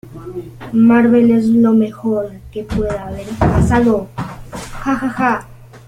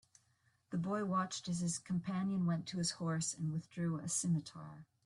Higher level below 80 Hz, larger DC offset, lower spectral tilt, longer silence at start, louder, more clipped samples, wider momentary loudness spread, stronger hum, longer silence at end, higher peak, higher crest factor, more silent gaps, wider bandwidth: first, -32 dBFS vs -74 dBFS; neither; first, -8 dB/octave vs -5 dB/octave; second, 0.05 s vs 0.7 s; first, -15 LUFS vs -38 LUFS; neither; first, 19 LU vs 6 LU; neither; about the same, 0.1 s vs 0.2 s; first, -2 dBFS vs -24 dBFS; about the same, 14 dB vs 14 dB; neither; about the same, 11 kHz vs 12 kHz